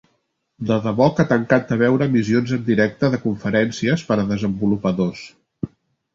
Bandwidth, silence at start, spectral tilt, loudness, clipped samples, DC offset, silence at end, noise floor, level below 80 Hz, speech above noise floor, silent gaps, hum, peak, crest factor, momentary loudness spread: 7.6 kHz; 0.6 s; -7 dB/octave; -19 LUFS; under 0.1%; under 0.1%; 0.5 s; -69 dBFS; -50 dBFS; 51 dB; none; none; -2 dBFS; 18 dB; 12 LU